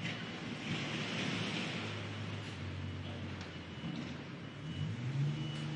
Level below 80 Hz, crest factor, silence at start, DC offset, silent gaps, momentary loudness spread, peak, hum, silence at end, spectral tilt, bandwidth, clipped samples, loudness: -70 dBFS; 14 dB; 0 s; under 0.1%; none; 8 LU; -26 dBFS; none; 0 s; -5.5 dB/octave; 10.5 kHz; under 0.1%; -40 LUFS